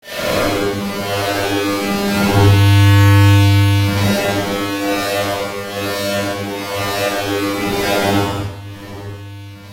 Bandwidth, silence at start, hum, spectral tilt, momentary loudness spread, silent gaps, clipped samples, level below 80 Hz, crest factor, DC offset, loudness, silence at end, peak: 16 kHz; 0.05 s; none; -5.5 dB/octave; 16 LU; none; under 0.1%; -40 dBFS; 16 dB; under 0.1%; -15 LUFS; 0 s; 0 dBFS